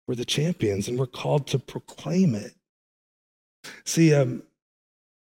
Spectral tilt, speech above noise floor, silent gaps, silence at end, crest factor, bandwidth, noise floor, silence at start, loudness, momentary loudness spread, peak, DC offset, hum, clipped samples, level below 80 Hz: -5.5 dB/octave; over 66 dB; 2.69-3.63 s; 0.95 s; 18 dB; 16.5 kHz; under -90 dBFS; 0.1 s; -24 LUFS; 19 LU; -8 dBFS; under 0.1%; none; under 0.1%; -62 dBFS